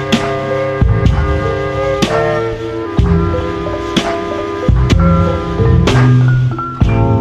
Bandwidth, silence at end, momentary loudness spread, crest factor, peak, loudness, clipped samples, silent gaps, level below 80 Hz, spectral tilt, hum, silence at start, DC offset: 9.8 kHz; 0 s; 8 LU; 12 dB; 0 dBFS; -14 LUFS; under 0.1%; none; -20 dBFS; -7 dB/octave; none; 0 s; under 0.1%